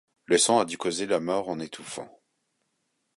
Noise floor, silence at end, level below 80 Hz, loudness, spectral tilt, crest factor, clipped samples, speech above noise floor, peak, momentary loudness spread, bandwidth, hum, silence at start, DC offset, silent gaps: -76 dBFS; 1.1 s; -68 dBFS; -26 LUFS; -2.5 dB/octave; 20 dB; under 0.1%; 50 dB; -8 dBFS; 18 LU; 11.5 kHz; none; 0.3 s; under 0.1%; none